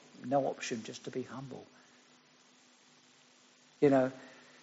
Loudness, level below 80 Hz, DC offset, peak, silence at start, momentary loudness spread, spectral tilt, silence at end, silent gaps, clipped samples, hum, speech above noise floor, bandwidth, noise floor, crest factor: -34 LUFS; -80 dBFS; under 0.1%; -14 dBFS; 0.15 s; 22 LU; -5.5 dB/octave; 0.3 s; none; under 0.1%; none; 31 dB; 8 kHz; -64 dBFS; 22 dB